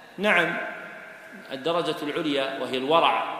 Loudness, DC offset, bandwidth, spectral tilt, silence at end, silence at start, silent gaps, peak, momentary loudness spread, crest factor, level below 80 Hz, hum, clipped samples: -24 LUFS; under 0.1%; 15.5 kHz; -4.5 dB/octave; 0 s; 0 s; none; -6 dBFS; 19 LU; 20 dB; -72 dBFS; none; under 0.1%